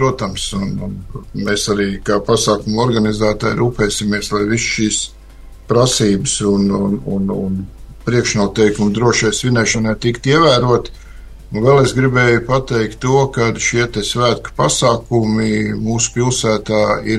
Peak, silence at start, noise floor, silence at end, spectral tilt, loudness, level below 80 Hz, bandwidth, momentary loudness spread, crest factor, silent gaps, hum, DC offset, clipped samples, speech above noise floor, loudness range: 0 dBFS; 0 s; -36 dBFS; 0 s; -4.5 dB/octave; -15 LUFS; -34 dBFS; 12.5 kHz; 8 LU; 16 dB; none; none; under 0.1%; under 0.1%; 21 dB; 3 LU